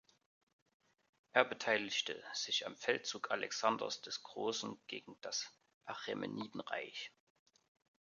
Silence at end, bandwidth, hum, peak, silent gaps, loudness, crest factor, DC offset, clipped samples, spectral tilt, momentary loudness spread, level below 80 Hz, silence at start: 0.95 s; 7.4 kHz; none; -12 dBFS; 5.74-5.81 s; -39 LUFS; 30 dB; under 0.1%; under 0.1%; -2 dB/octave; 14 LU; -86 dBFS; 1.35 s